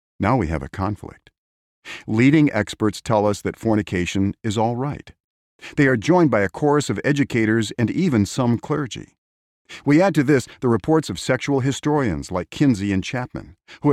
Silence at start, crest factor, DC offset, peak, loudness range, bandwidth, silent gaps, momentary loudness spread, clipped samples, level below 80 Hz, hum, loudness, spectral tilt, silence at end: 0.2 s; 16 dB; under 0.1%; -4 dBFS; 2 LU; 14 kHz; 1.38-1.82 s, 5.20-5.59 s, 9.18-9.65 s; 12 LU; under 0.1%; -46 dBFS; none; -20 LUFS; -6.5 dB/octave; 0 s